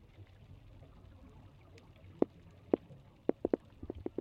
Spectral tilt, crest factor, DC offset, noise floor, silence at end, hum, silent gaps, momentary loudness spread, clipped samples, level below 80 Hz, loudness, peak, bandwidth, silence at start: -9.5 dB/octave; 30 dB; under 0.1%; -58 dBFS; 0.1 s; none; none; 22 LU; under 0.1%; -62 dBFS; -38 LUFS; -10 dBFS; 7 kHz; 0.2 s